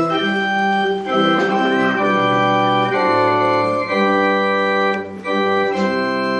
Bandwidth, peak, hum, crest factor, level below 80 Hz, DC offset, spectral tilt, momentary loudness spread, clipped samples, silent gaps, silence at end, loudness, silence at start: 10 kHz; -4 dBFS; none; 14 dB; -60 dBFS; under 0.1%; -6 dB/octave; 3 LU; under 0.1%; none; 0 s; -17 LUFS; 0 s